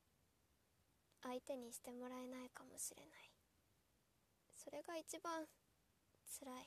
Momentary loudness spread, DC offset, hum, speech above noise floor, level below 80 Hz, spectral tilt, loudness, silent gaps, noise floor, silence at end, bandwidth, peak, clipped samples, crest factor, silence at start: 15 LU; under 0.1%; none; 28 dB; -88 dBFS; -2 dB/octave; -53 LUFS; none; -82 dBFS; 0 s; 14 kHz; -36 dBFS; under 0.1%; 20 dB; 1.2 s